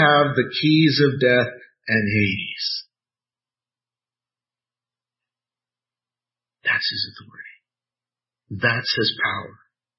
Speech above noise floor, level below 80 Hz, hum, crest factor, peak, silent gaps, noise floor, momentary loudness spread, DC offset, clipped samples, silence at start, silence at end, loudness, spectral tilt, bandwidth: over 70 dB; -60 dBFS; none; 20 dB; -2 dBFS; none; under -90 dBFS; 14 LU; under 0.1%; under 0.1%; 0 s; 0.45 s; -20 LUFS; -8 dB/octave; 6 kHz